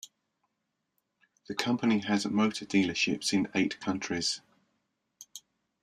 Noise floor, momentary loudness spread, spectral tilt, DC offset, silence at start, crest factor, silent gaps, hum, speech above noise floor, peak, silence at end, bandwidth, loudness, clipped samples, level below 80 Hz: -82 dBFS; 16 LU; -4 dB/octave; under 0.1%; 0.05 s; 24 dB; none; none; 53 dB; -8 dBFS; 0.45 s; 13.5 kHz; -29 LUFS; under 0.1%; -70 dBFS